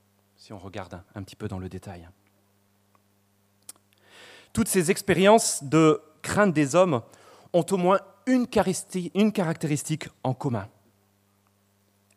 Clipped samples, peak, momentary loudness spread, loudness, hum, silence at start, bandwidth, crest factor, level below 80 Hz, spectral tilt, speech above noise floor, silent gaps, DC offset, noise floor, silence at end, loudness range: under 0.1%; -6 dBFS; 20 LU; -24 LUFS; none; 0.5 s; 15.5 kHz; 22 dB; -58 dBFS; -5 dB/octave; 42 dB; none; under 0.1%; -66 dBFS; 1.5 s; 19 LU